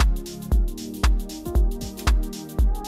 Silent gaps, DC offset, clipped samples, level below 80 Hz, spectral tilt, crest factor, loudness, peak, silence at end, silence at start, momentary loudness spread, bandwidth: none; under 0.1%; under 0.1%; -22 dBFS; -5.5 dB/octave; 14 dB; -26 LUFS; -8 dBFS; 0 s; 0 s; 5 LU; 15.5 kHz